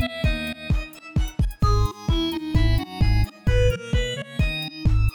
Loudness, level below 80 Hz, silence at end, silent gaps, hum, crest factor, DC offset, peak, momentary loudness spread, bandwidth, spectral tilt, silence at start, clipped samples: -24 LUFS; -24 dBFS; 0 s; none; none; 14 dB; under 0.1%; -8 dBFS; 6 LU; over 20 kHz; -6 dB/octave; 0 s; under 0.1%